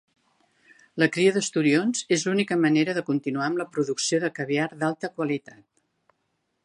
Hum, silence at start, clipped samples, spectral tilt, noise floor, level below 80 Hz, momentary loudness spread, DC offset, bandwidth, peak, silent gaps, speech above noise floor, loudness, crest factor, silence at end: none; 0.95 s; under 0.1%; -4.5 dB/octave; -75 dBFS; -74 dBFS; 7 LU; under 0.1%; 11.5 kHz; -6 dBFS; none; 51 dB; -24 LUFS; 20 dB; 1.25 s